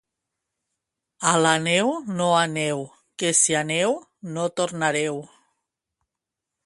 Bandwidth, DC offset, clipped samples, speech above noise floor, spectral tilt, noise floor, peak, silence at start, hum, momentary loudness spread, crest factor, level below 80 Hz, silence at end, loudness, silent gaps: 11.5 kHz; under 0.1%; under 0.1%; 63 dB; -3 dB/octave; -86 dBFS; -4 dBFS; 1.2 s; none; 12 LU; 22 dB; -68 dBFS; 1.4 s; -22 LUFS; none